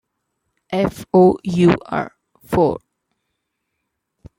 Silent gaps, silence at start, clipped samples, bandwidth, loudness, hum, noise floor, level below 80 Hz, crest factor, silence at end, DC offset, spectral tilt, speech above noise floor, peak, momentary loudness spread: none; 0.7 s; under 0.1%; 16 kHz; -17 LUFS; none; -76 dBFS; -48 dBFS; 20 dB; 1.6 s; under 0.1%; -8 dB/octave; 60 dB; 0 dBFS; 12 LU